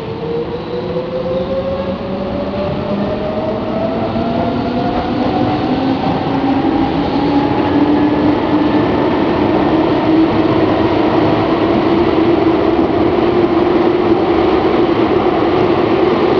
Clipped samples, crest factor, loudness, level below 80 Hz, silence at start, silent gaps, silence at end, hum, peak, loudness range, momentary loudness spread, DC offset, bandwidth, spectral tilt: under 0.1%; 14 dB; -14 LUFS; -36 dBFS; 0 s; none; 0 s; none; 0 dBFS; 6 LU; 7 LU; under 0.1%; 5.4 kHz; -8.5 dB/octave